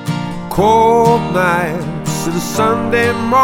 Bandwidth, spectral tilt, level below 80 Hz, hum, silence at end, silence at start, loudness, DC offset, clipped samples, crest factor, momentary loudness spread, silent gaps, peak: 17 kHz; -5.5 dB/octave; -38 dBFS; none; 0 s; 0 s; -14 LUFS; under 0.1%; under 0.1%; 14 dB; 10 LU; none; 0 dBFS